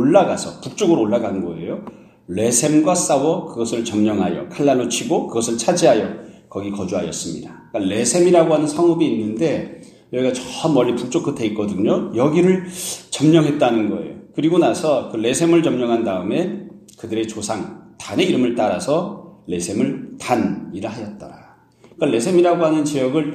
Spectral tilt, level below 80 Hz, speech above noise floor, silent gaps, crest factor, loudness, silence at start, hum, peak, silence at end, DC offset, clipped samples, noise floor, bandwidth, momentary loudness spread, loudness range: -5 dB/octave; -58 dBFS; 31 dB; none; 18 dB; -19 LUFS; 0 s; none; 0 dBFS; 0 s; under 0.1%; under 0.1%; -49 dBFS; 14.5 kHz; 14 LU; 4 LU